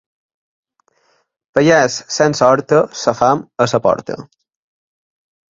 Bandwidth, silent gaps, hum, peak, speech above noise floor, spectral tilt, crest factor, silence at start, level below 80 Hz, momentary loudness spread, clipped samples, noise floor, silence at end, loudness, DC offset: 7.8 kHz; none; none; 0 dBFS; 47 dB; -4.5 dB/octave; 16 dB; 1.55 s; -54 dBFS; 9 LU; under 0.1%; -61 dBFS; 1.25 s; -14 LUFS; under 0.1%